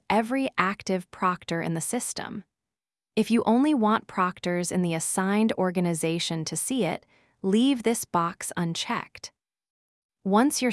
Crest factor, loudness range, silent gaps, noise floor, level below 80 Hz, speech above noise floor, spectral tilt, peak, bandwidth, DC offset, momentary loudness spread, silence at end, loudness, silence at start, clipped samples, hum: 22 dB; 3 LU; 9.70-10.09 s; under -90 dBFS; -66 dBFS; over 64 dB; -4.5 dB/octave; -4 dBFS; 12 kHz; under 0.1%; 10 LU; 0 s; -26 LUFS; 0.1 s; under 0.1%; none